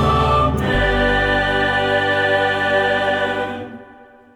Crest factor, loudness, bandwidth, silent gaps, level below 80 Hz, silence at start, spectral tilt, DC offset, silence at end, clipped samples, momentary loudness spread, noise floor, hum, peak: 12 dB; -17 LUFS; 17.5 kHz; none; -30 dBFS; 0 s; -6 dB/octave; under 0.1%; 0.3 s; under 0.1%; 7 LU; -44 dBFS; none; -6 dBFS